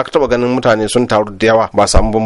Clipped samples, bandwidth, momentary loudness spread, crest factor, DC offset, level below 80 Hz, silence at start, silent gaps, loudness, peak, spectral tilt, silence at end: under 0.1%; 12 kHz; 2 LU; 12 dB; under 0.1%; -22 dBFS; 0 s; none; -12 LUFS; 0 dBFS; -5 dB/octave; 0 s